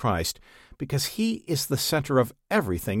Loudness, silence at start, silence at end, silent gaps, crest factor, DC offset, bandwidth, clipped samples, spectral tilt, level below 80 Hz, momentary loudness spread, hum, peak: -26 LUFS; 0 s; 0 s; none; 18 dB; under 0.1%; 17.5 kHz; under 0.1%; -4.5 dB/octave; -48 dBFS; 7 LU; none; -8 dBFS